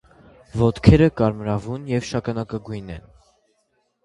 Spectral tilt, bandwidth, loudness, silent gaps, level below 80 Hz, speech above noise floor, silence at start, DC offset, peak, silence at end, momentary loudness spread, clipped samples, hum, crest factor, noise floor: -8 dB/octave; 11 kHz; -20 LUFS; none; -36 dBFS; 49 dB; 0.55 s; under 0.1%; 0 dBFS; 1.05 s; 18 LU; under 0.1%; none; 22 dB; -69 dBFS